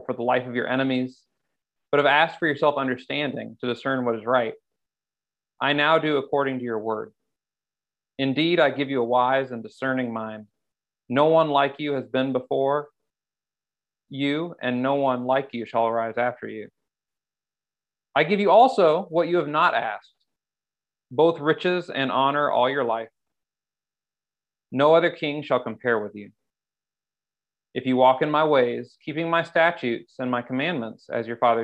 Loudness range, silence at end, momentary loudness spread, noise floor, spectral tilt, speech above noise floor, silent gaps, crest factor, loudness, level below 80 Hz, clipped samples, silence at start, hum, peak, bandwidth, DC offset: 5 LU; 0 s; 12 LU; under -90 dBFS; -7 dB/octave; over 67 dB; none; 20 dB; -23 LUFS; -74 dBFS; under 0.1%; 0 s; 50 Hz at -60 dBFS; -4 dBFS; 8.8 kHz; under 0.1%